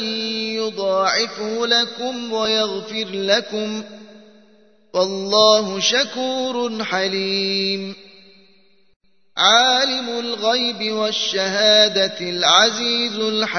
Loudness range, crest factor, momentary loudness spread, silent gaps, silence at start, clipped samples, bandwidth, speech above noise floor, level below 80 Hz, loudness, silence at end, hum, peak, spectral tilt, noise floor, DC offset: 6 LU; 20 dB; 12 LU; 8.96-9.00 s; 0 s; under 0.1%; 6.6 kHz; 39 dB; -72 dBFS; -18 LUFS; 0 s; none; 0 dBFS; -2 dB/octave; -57 dBFS; 0.2%